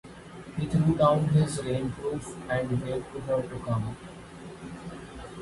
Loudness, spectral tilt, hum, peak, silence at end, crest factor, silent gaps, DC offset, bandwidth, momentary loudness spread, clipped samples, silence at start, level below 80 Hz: -28 LUFS; -7 dB/octave; none; -10 dBFS; 0 s; 18 dB; none; under 0.1%; 11.5 kHz; 20 LU; under 0.1%; 0.05 s; -50 dBFS